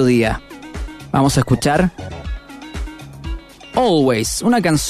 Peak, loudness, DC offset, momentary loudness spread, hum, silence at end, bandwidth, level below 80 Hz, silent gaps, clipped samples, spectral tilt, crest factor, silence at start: -2 dBFS; -16 LUFS; under 0.1%; 17 LU; none; 0 s; 14 kHz; -32 dBFS; none; under 0.1%; -5 dB/octave; 16 dB; 0 s